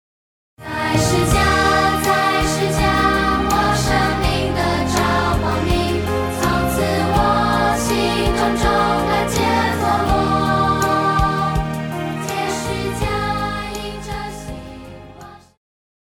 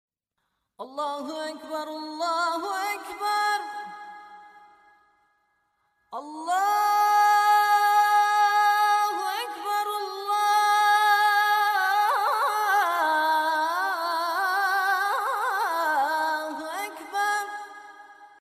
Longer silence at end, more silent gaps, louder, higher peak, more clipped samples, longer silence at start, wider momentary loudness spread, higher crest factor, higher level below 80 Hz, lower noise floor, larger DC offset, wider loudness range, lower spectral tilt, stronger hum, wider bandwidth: first, 0.7 s vs 0.15 s; neither; first, -18 LUFS vs -24 LUFS; first, -2 dBFS vs -10 dBFS; neither; second, 0.6 s vs 0.8 s; second, 11 LU vs 15 LU; about the same, 16 dB vs 16 dB; first, -30 dBFS vs -82 dBFS; second, -40 dBFS vs -79 dBFS; neither; second, 7 LU vs 10 LU; first, -5 dB/octave vs 1 dB/octave; neither; about the same, 17 kHz vs 15.5 kHz